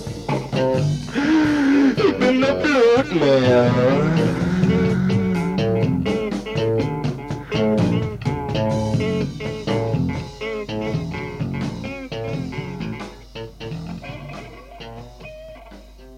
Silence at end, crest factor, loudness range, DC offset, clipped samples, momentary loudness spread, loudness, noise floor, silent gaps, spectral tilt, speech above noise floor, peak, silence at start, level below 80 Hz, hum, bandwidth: 0 s; 14 dB; 14 LU; under 0.1%; under 0.1%; 19 LU; -20 LUFS; -41 dBFS; none; -7 dB/octave; 25 dB; -6 dBFS; 0 s; -42 dBFS; none; 12.5 kHz